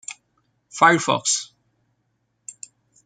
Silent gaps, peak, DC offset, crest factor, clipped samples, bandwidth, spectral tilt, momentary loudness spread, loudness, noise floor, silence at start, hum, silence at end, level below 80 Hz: none; -2 dBFS; under 0.1%; 22 dB; under 0.1%; 9.8 kHz; -2.5 dB/octave; 25 LU; -18 LUFS; -71 dBFS; 0.1 s; none; 0.55 s; -74 dBFS